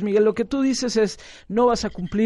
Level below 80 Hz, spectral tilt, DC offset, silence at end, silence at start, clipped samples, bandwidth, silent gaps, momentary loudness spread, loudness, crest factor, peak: -46 dBFS; -5 dB/octave; under 0.1%; 0 s; 0 s; under 0.1%; 11.5 kHz; none; 7 LU; -22 LUFS; 14 dB; -8 dBFS